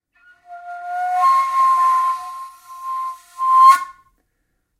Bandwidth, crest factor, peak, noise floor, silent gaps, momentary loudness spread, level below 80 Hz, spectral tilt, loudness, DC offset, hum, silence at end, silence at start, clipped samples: 16 kHz; 18 dB; -2 dBFS; -70 dBFS; none; 23 LU; -70 dBFS; 1 dB/octave; -16 LUFS; under 0.1%; none; 0.85 s; 0.5 s; under 0.1%